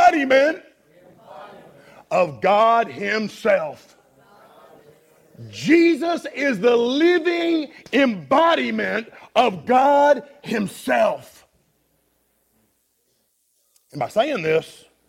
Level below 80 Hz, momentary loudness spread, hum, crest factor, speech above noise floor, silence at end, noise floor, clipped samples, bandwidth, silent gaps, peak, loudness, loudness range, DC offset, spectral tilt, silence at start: -66 dBFS; 12 LU; none; 18 dB; 48 dB; 0.4 s; -67 dBFS; under 0.1%; 15.5 kHz; none; -4 dBFS; -19 LUFS; 8 LU; under 0.1%; -5 dB/octave; 0 s